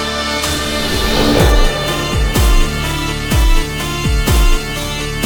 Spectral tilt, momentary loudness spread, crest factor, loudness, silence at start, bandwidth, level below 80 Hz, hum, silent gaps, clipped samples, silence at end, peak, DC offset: -4 dB/octave; 6 LU; 14 dB; -15 LUFS; 0 s; over 20 kHz; -16 dBFS; none; none; under 0.1%; 0 s; 0 dBFS; under 0.1%